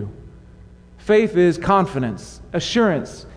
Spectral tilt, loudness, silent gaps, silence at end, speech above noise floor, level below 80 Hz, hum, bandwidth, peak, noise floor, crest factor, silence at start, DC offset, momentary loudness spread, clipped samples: -6 dB/octave; -19 LUFS; none; 0 s; 25 dB; -44 dBFS; none; 10.5 kHz; -4 dBFS; -44 dBFS; 16 dB; 0 s; under 0.1%; 16 LU; under 0.1%